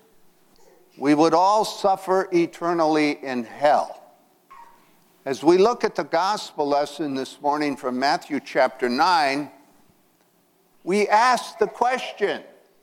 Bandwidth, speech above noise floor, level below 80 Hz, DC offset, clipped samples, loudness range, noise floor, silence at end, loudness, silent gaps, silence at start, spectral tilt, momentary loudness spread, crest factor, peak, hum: 16 kHz; 41 dB; -68 dBFS; under 0.1%; under 0.1%; 3 LU; -62 dBFS; 0.35 s; -22 LUFS; none; 1 s; -4.5 dB/octave; 11 LU; 18 dB; -4 dBFS; none